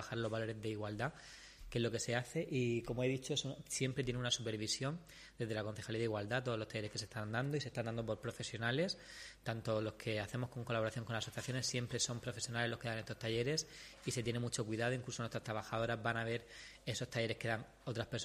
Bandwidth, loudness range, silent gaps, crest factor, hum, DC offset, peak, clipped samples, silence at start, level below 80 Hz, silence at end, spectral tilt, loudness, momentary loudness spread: 15 kHz; 2 LU; none; 20 dB; none; under 0.1%; -20 dBFS; under 0.1%; 0 s; -64 dBFS; 0 s; -4.5 dB/octave; -40 LUFS; 6 LU